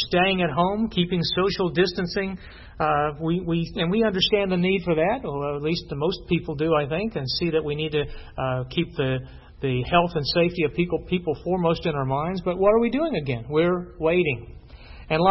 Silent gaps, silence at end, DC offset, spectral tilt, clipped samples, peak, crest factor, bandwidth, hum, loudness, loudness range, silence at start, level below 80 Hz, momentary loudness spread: none; 0 s; under 0.1%; -7.5 dB/octave; under 0.1%; -4 dBFS; 20 dB; 6 kHz; none; -24 LUFS; 2 LU; 0 s; -44 dBFS; 7 LU